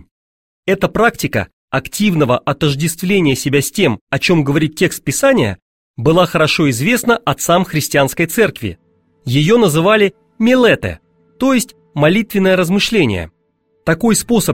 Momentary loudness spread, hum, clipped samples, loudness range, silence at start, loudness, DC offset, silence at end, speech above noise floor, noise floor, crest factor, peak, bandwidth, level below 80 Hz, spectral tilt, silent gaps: 9 LU; none; under 0.1%; 2 LU; 0.65 s; -14 LUFS; 0.4%; 0 s; 48 dB; -61 dBFS; 14 dB; 0 dBFS; 16.5 kHz; -42 dBFS; -5 dB/octave; 1.53-1.68 s, 4.01-4.07 s, 5.62-5.94 s